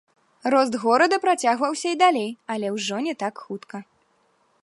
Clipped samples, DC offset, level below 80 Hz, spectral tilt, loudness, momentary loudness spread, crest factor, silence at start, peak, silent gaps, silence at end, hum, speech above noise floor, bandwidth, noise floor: under 0.1%; under 0.1%; -76 dBFS; -3.5 dB/octave; -22 LUFS; 16 LU; 18 dB; 0.45 s; -6 dBFS; none; 0.8 s; none; 43 dB; 11.5 kHz; -65 dBFS